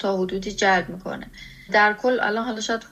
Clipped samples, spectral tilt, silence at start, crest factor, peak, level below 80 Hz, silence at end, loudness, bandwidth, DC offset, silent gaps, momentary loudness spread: under 0.1%; -4 dB/octave; 0 s; 16 dB; -6 dBFS; -50 dBFS; 0.05 s; -22 LUFS; 15 kHz; under 0.1%; none; 16 LU